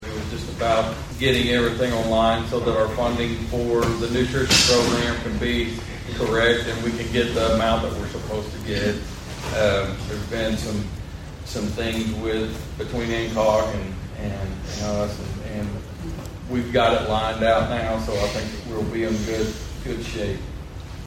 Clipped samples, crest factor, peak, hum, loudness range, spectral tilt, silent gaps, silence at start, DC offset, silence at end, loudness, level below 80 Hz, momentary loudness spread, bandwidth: under 0.1%; 20 dB; -4 dBFS; none; 6 LU; -4.5 dB/octave; none; 0 s; under 0.1%; 0 s; -23 LUFS; -36 dBFS; 12 LU; 16 kHz